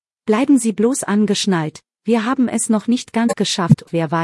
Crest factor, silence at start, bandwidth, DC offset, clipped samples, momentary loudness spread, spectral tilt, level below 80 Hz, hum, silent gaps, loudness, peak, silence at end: 16 dB; 0.25 s; 12 kHz; under 0.1%; under 0.1%; 5 LU; -5 dB/octave; -58 dBFS; none; none; -17 LUFS; 0 dBFS; 0 s